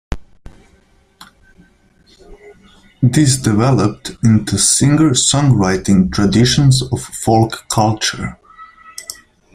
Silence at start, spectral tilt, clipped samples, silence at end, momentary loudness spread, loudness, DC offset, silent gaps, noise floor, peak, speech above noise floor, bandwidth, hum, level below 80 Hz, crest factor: 0.1 s; -4.5 dB/octave; under 0.1%; 0.4 s; 18 LU; -13 LUFS; under 0.1%; none; -52 dBFS; 0 dBFS; 39 dB; 16 kHz; none; -36 dBFS; 16 dB